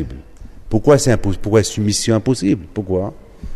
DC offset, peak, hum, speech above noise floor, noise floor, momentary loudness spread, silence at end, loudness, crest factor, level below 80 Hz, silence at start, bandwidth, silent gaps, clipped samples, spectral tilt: under 0.1%; 0 dBFS; none; 20 dB; -35 dBFS; 15 LU; 0 s; -17 LUFS; 16 dB; -32 dBFS; 0 s; 13.5 kHz; none; under 0.1%; -5.5 dB/octave